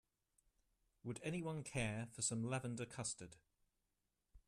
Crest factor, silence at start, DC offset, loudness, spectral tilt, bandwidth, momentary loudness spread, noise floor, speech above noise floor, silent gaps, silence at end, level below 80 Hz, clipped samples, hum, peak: 20 dB; 1.05 s; under 0.1%; -45 LUFS; -4.5 dB/octave; 13.5 kHz; 10 LU; -88 dBFS; 43 dB; none; 0.1 s; -70 dBFS; under 0.1%; none; -26 dBFS